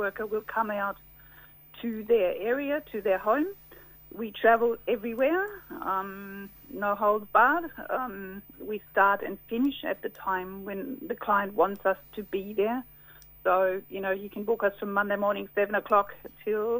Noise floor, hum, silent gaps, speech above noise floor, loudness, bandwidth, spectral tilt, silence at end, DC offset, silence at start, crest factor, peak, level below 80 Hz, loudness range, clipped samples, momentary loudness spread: -53 dBFS; none; none; 24 dB; -28 LUFS; 16 kHz; -7 dB/octave; 0 s; under 0.1%; 0 s; 22 dB; -8 dBFS; -62 dBFS; 3 LU; under 0.1%; 14 LU